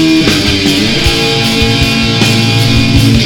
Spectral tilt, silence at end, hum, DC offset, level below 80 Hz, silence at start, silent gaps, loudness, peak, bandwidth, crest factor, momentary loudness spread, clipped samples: -4.5 dB/octave; 0 s; none; under 0.1%; -22 dBFS; 0 s; none; -8 LUFS; 0 dBFS; 18.5 kHz; 8 dB; 1 LU; 0.3%